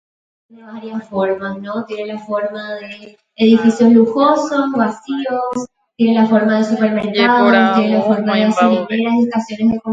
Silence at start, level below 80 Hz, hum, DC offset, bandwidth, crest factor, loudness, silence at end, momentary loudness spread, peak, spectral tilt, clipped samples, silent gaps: 0.65 s; -58 dBFS; none; under 0.1%; 7.8 kHz; 14 dB; -15 LUFS; 0 s; 16 LU; 0 dBFS; -6 dB/octave; under 0.1%; none